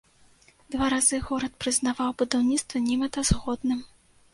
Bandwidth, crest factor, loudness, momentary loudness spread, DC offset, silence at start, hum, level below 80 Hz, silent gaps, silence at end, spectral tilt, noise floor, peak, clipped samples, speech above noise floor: 11.5 kHz; 20 dB; -26 LUFS; 7 LU; under 0.1%; 0.7 s; none; -42 dBFS; none; 0.45 s; -3.5 dB/octave; -58 dBFS; -6 dBFS; under 0.1%; 32 dB